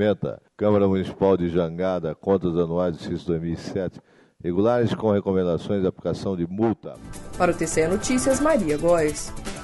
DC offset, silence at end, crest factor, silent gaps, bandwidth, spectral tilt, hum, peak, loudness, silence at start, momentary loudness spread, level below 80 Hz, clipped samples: under 0.1%; 0 s; 16 dB; none; 11.5 kHz; -6 dB/octave; none; -6 dBFS; -23 LUFS; 0 s; 10 LU; -44 dBFS; under 0.1%